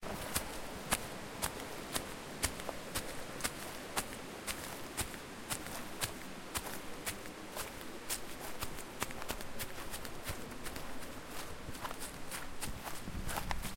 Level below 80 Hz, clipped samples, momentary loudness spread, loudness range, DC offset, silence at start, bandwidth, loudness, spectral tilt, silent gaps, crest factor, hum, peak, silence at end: -52 dBFS; under 0.1%; 7 LU; 4 LU; under 0.1%; 0 s; 17 kHz; -42 LUFS; -2.5 dB/octave; none; 30 dB; none; -12 dBFS; 0 s